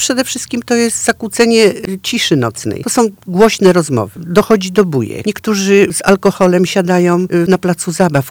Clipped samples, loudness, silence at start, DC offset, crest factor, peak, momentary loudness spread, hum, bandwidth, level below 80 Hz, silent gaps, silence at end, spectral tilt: under 0.1%; -12 LUFS; 0 s; under 0.1%; 12 dB; 0 dBFS; 7 LU; none; over 20 kHz; -46 dBFS; none; 0 s; -4.5 dB/octave